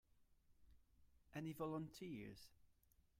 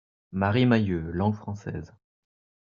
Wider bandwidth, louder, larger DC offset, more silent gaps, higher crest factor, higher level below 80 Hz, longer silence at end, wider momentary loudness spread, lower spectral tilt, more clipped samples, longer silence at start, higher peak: first, 16 kHz vs 7 kHz; second, -52 LUFS vs -26 LUFS; neither; neither; about the same, 18 dB vs 20 dB; second, -76 dBFS vs -56 dBFS; second, 0.45 s vs 0.75 s; about the same, 14 LU vs 15 LU; about the same, -6.5 dB/octave vs -6.5 dB/octave; neither; second, 0.15 s vs 0.3 s; second, -36 dBFS vs -6 dBFS